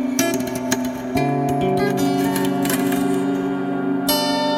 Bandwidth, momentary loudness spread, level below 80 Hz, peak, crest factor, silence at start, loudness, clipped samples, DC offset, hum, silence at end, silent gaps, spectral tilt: 17 kHz; 4 LU; -50 dBFS; -2 dBFS; 16 dB; 0 s; -20 LUFS; under 0.1%; under 0.1%; none; 0 s; none; -4.5 dB/octave